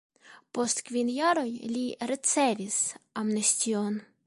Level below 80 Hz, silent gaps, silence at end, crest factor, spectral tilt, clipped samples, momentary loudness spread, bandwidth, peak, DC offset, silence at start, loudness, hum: -76 dBFS; none; 0.25 s; 18 dB; -2.5 dB/octave; under 0.1%; 8 LU; 11.5 kHz; -12 dBFS; under 0.1%; 0.25 s; -28 LUFS; none